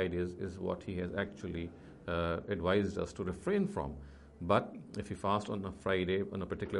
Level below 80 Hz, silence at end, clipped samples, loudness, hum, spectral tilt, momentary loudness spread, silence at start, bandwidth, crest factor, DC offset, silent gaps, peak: -56 dBFS; 0 s; under 0.1%; -36 LUFS; none; -7 dB/octave; 11 LU; 0 s; 11.5 kHz; 22 dB; under 0.1%; none; -14 dBFS